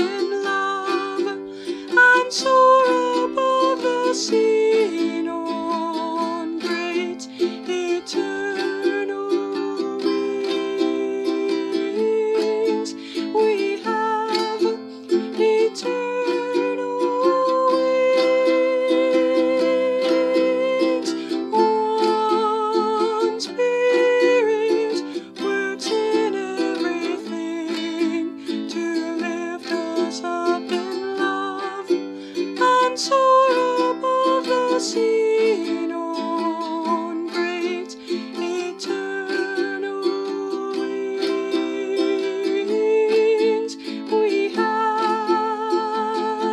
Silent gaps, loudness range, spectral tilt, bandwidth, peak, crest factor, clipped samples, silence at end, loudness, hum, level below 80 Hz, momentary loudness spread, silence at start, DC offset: none; 7 LU; -3.5 dB/octave; 12 kHz; -4 dBFS; 18 dB; under 0.1%; 0 s; -21 LUFS; none; -74 dBFS; 9 LU; 0 s; under 0.1%